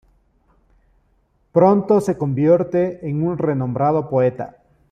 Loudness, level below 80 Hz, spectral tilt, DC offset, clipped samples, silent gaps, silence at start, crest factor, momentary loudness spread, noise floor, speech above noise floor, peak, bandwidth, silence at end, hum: -18 LUFS; -54 dBFS; -9.5 dB/octave; under 0.1%; under 0.1%; none; 1.55 s; 18 dB; 8 LU; -62 dBFS; 44 dB; -2 dBFS; 10.5 kHz; 0.4 s; none